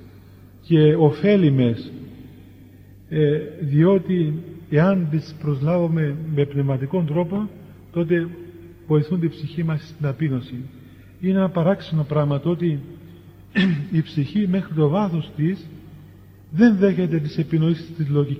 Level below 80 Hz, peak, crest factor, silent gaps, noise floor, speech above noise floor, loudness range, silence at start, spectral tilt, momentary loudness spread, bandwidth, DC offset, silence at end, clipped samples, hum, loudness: -54 dBFS; -2 dBFS; 18 dB; none; -45 dBFS; 26 dB; 4 LU; 0 s; -9.5 dB/octave; 13 LU; 6 kHz; under 0.1%; 0 s; under 0.1%; none; -21 LUFS